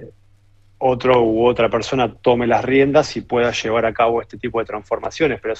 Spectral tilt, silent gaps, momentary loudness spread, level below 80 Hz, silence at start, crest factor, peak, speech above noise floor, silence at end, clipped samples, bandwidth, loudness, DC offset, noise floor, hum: -5.5 dB/octave; none; 10 LU; -46 dBFS; 0 s; 18 dB; 0 dBFS; 34 dB; 0 s; under 0.1%; 8.2 kHz; -18 LUFS; under 0.1%; -51 dBFS; none